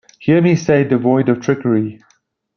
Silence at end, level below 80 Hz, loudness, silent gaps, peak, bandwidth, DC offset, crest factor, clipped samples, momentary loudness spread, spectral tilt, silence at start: 0.6 s; -56 dBFS; -15 LUFS; none; -2 dBFS; 6.8 kHz; under 0.1%; 14 dB; under 0.1%; 5 LU; -7.5 dB/octave; 0.2 s